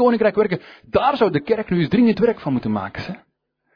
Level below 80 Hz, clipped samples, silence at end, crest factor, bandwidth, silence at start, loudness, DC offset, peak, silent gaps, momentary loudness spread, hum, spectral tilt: -50 dBFS; under 0.1%; 0.6 s; 14 dB; 5.4 kHz; 0 s; -19 LUFS; under 0.1%; -4 dBFS; none; 13 LU; none; -9 dB/octave